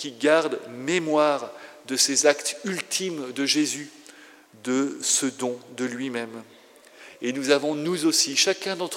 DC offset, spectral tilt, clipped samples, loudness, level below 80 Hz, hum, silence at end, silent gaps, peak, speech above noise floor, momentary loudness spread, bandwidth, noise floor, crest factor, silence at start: under 0.1%; -2 dB/octave; under 0.1%; -24 LUFS; -90 dBFS; none; 0 s; none; -2 dBFS; 26 dB; 13 LU; 16 kHz; -50 dBFS; 22 dB; 0 s